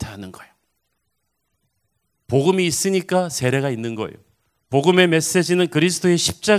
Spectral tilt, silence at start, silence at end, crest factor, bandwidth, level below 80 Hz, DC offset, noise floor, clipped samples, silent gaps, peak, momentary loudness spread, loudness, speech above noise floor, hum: -4.5 dB/octave; 0 s; 0 s; 20 dB; 16 kHz; -52 dBFS; under 0.1%; -74 dBFS; under 0.1%; none; 0 dBFS; 14 LU; -18 LUFS; 55 dB; none